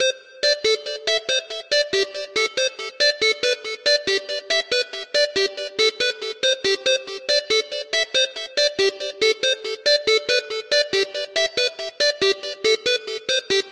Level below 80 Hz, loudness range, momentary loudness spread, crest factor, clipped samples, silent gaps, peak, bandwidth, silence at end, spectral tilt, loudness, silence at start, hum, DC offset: -64 dBFS; 1 LU; 5 LU; 16 dB; under 0.1%; none; -6 dBFS; 14 kHz; 0 s; 0 dB/octave; -20 LUFS; 0 s; none; under 0.1%